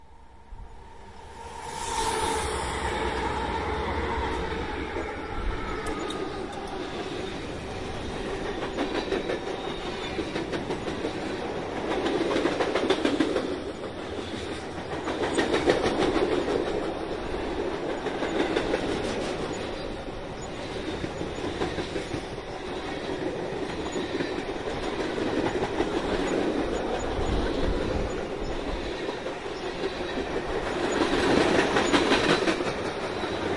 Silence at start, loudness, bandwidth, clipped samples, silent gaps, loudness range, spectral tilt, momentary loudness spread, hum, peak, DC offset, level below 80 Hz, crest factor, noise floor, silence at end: 0 s; -29 LUFS; 11.5 kHz; under 0.1%; none; 6 LU; -4.5 dB/octave; 10 LU; none; -6 dBFS; 0.3%; -42 dBFS; 22 dB; -51 dBFS; 0 s